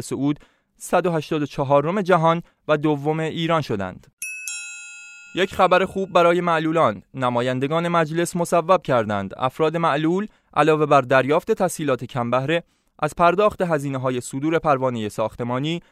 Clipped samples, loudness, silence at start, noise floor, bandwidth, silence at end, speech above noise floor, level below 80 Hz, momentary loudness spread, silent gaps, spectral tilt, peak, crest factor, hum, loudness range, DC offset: under 0.1%; -21 LUFS; 0 s; -41 dBFS; 15 kHz; 0.1 s; 21 dB; -54 dBFS; 11 LU; 4.13-4.17 s; -5.5 dB/octave; -2 dBFS; 18 dB; none; 3 LU; under 0.1%